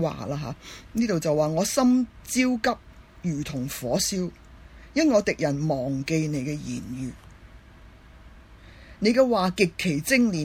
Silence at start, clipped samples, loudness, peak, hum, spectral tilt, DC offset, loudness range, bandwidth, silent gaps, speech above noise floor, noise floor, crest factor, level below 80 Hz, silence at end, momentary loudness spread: 0 s; under 0.1%; -25 LUFS; -6 dBFS; none; -5 dB/octave; under 0.1%; 5 LU; 16.5 kHz; none; 25 dB; -49 dBFS; 18 dB; -50 dBFS; 0 s; 12 LU